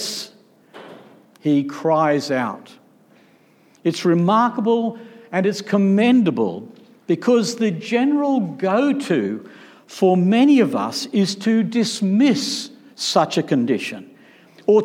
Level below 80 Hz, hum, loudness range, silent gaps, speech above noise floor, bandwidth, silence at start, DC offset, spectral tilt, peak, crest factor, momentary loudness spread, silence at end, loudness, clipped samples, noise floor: -76 dBFS; none; 4 LU; none; 36 dB; 16 kHz; 0 s; under 0.1%; -5.5 dB/octave; -4 dBFS; 16 dB; 12 LU; 0 s; -19 LUFS; under 0.1%; -54 dBFS